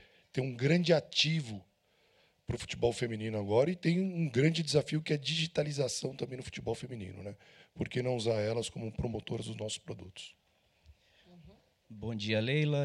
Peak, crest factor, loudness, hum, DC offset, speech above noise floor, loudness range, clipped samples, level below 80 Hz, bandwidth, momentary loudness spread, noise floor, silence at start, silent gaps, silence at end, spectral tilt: -14 dBFS; 20 dB; -33 LUFS; none; under 0.1%; 38 dB; 9 LU; under 0.1%; -60 dBFS; 12 kHz; 16 LU; -71 dBFS; 0.35 s; none; 0 s; -5.5 dB/octave